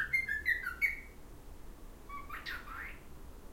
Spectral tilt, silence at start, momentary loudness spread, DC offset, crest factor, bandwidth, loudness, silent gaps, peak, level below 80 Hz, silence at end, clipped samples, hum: -3 dB/octave; 0 s; 23 LU; under 0.1%; 20 dB; 16 kHz; -36 LUFS; none; -20 dBFS; -52 dBFS; 0 s; under 0.1%; none